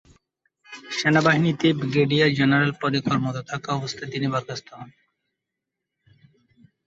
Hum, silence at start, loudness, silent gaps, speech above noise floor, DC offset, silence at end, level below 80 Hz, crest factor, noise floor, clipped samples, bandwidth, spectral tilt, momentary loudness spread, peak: none; 0.7 s; -22 LUFS; none; 62 dB; under 0.1%; 1.95 s; -60 dBFS; 20 dB; -84 dBFS; under 0.1%; 8 kHz; -6 dB/octave; 17 LU; -4 dBFS